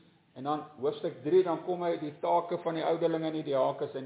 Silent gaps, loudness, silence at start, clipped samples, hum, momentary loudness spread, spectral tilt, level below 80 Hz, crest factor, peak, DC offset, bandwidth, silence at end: none; -31 LUFS; 0.35 s; under 0.1%; none; 8 LU; -5.5 dB/octave; -82 dBFS; 16 dB; -16 dBFS; under 0.1%; 4 kHz; 0 s